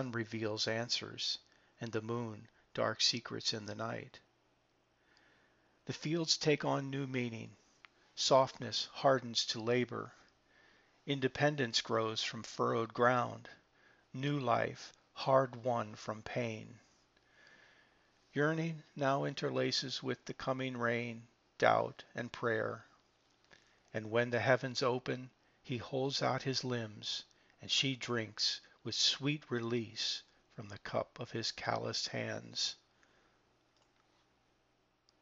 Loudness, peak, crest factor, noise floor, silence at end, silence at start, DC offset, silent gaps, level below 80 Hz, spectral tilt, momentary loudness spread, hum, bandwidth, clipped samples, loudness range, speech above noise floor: -36 LUFS; -12 dBFS; 26 dB; -76 dBFS; 2.45 s; 0 s; under 0.1%; none; -76 dBFS; -3 dB/octave; 15 LU; none; 8 kHz; under 0.1%; 5 LU; 40 dB